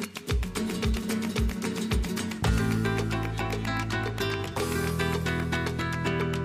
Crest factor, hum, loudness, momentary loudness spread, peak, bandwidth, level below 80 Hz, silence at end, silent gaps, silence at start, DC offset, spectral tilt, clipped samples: 16 dB; none; -29 LUFS; 4 LU; -14 dBFS; 16 kHz; -36 dBFS; 0 s; none; 0 s; under 0.1%; -5.5 dB/octave; under 0.1%